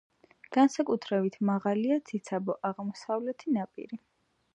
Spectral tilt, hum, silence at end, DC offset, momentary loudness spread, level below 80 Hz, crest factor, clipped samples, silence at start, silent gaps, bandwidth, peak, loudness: -6.5 dB/octave; none; 0.6 s; under 0.1%; 13 LU; -80 dBFS; 18 dB; under 0.1%; 0.5 s; none; 9.6 kHz; -12 dBFS; -30 LUFS